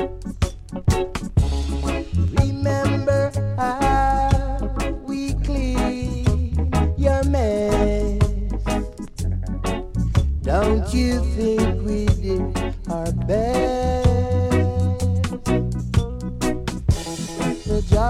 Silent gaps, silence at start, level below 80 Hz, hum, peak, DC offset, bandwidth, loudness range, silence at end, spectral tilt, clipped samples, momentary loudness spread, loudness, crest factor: none; 0 s; -26 dBFS; none; -2 dBFS; under 0.1%; 14 kHz; 2 LU; 0 s; -7 dB/octave; under 0.1%; 7 LU; -22 LUFS; 18 dB